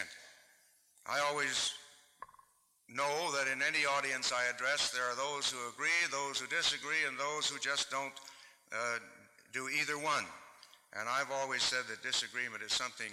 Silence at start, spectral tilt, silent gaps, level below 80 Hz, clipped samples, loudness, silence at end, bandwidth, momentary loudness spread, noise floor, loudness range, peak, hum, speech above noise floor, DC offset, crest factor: 0 s; -0.5 dB/octave; none; -80 dBFS; under 0.1%; -34 LUFS; 0 s; 16 kHz; 14 LU; -68 dBFS; 5 LU; -22 dBFS; none; 32 dB; under 0.1%; 16 dB